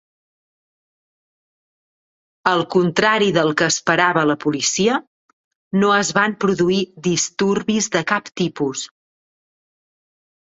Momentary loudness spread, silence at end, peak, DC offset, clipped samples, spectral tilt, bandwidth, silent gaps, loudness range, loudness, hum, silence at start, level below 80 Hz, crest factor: 8 LU; 1.55 s; -2 dBFS; under 0.1%; under 0.1%; -3.5 dB/octave; 8.2 kHz; 5.07-5.71 s; 5 LU; -18 LUFS; none; 2.45 s; -60 dBFS; 18 dB